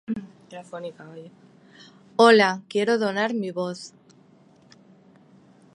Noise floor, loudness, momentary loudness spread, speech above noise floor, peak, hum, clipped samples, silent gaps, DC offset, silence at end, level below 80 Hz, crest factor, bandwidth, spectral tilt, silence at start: -55 dBFS; -21 LUFS; 27 LU; 33 dB; -2 dBFS; none; under 0.1%; none; under 0.1%; 1.85 s; -74 dBFS; 24 dB; 11 kHz; -4.5 dB/octave; 0.1 s